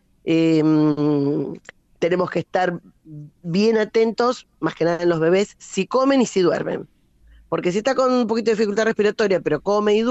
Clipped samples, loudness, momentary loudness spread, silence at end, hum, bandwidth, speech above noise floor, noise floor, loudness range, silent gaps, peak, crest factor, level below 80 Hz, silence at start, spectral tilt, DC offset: under 0.1%; -20 LUFS; 10 LU; 0 s; none; 8.2 kHz; 32 dB; -52 dBFS; 2 LU; none; -8 dBFS; 12 dB; -58 dBFS; 0.25 s; -6 dB/octave; under 0.1%